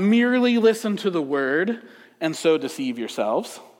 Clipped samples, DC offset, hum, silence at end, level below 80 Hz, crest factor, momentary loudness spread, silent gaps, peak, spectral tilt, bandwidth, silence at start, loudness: under 0.1%; under 0.1%; none; 0.15 s; -80 dBFS; 16 dB; 10 LU; none; -6 dBFS; -5 dB/octave; 16 kHz; 0 s; -22 LUFS